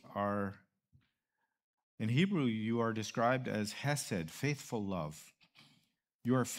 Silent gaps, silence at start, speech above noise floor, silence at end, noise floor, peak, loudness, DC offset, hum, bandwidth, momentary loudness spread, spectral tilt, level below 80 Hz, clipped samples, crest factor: 1.64-1.74 s, 1.83-1.98 s, 6.14-6.19 s; 0.05 s; 52 dB; 0 s; -87 dBFS; -18 dBFS; -36 LUFS; under 0.1%; none; 16 kHz; 9 LU; -5.5 dB/octave; -72 dBFS; under 0.1%; 20 dB